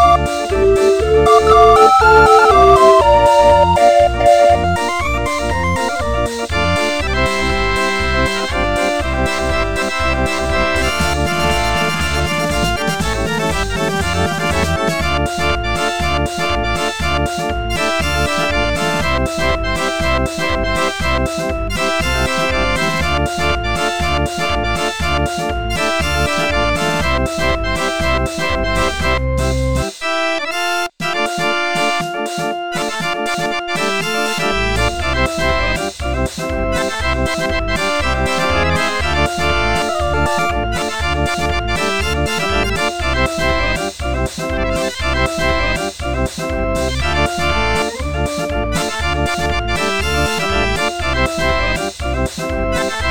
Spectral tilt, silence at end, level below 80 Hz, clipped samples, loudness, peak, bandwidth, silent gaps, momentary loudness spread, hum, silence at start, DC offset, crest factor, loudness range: -4.5 dB/octave; 0 s; -24 dBFS; under 0.1%; -16 LUFS; 0 dBFS; 18 kHz; none; 9 LU; none; 0 s; 3%; 16 dB; 7 LU